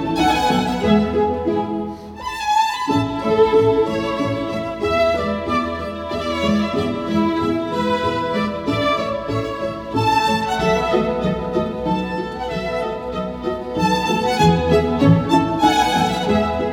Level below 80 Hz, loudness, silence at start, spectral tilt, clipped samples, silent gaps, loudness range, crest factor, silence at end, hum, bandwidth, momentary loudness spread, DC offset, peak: -38 dBFS; -19 LUFS; 0 s; -6 dB/octave; under 0.1%; none; 4 LU; 16 dB; 0 s; none; 18.5 kHz; 9 LU; under 0.1%; -2 dBFS